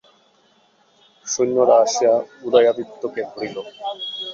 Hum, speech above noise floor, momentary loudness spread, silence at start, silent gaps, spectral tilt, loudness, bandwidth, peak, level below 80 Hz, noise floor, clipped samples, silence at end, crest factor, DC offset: none; 39 dB; 15 LU; 1.25 s; none; -3 dB/octave; -19 LUFS; 7.6 kHz; -2 dBFS; -68 dBFS; -58 dBFS; under 0.1%; 0 s; 18 dB; under 0.1%